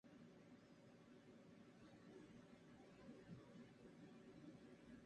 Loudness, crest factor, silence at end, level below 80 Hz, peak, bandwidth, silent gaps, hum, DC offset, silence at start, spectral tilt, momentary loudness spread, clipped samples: -65 LUFS; 16 dB; 0 s; -84 dBFS; -48 dBFS; 9 kHz; none; none; under 0.1%; 0.05 s; -6.5 dB/octave; 5 LU; under 0.1%